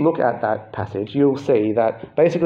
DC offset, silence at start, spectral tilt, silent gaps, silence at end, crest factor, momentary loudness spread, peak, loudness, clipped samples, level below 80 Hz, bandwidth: under 0.1%; 0 s; -8 dB/octave; none; 0 s; 14 dB; 9 LU; -4 dBFS; -20 LUFS; under 0.1%; -60 dBFS; 7.6 kHz